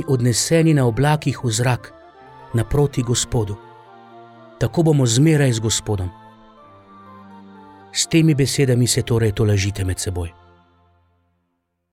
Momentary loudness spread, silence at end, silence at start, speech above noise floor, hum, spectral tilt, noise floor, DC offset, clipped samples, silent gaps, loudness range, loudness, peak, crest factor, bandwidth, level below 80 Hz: 11 LU; 1.65 s; 0 s; 55 dB; none; -5 dB/octave; -72 dBFS; under 0.1%; under 0.1%; none; 3 LU; -18 LUFS; -4 dBFS; 16 dB; 16 kHz; -42 dBFS